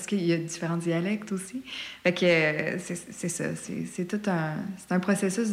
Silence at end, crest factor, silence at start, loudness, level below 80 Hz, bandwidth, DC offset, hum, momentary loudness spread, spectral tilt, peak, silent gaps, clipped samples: 0 s; 16 dB; 0 s; -28 LUFS; -68 dBFS; 15.5 kHz; under 0.1%; none; 12 LU; -5 dB/octave; -12 dBFS; none; under 0.1%